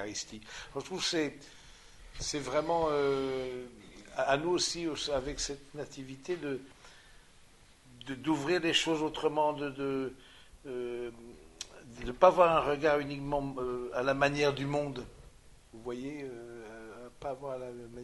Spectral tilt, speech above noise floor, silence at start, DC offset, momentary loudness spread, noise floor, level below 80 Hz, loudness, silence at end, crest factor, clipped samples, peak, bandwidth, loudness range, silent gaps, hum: -4 dB/octave; 26 dB; 0 s; under 0.1%; 18 LU; -59 dBFS; -56 dBFS; -32 LUFS; 0 s; 26 dB; under 0.1%; -8 dBFS; 11.5 kHz; 9 LU; none; none